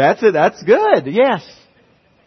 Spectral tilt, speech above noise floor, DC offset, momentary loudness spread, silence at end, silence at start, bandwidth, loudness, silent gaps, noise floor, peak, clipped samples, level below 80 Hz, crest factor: -6 dB/octave; 40 dB; under 0.1%; 4 LU; 0.85 s; 0 s; 6.4 kHz; -14 LUFS; none; -54 dBFS; 0 dBFS; under 0.1%; -62 dBFS; 14 dB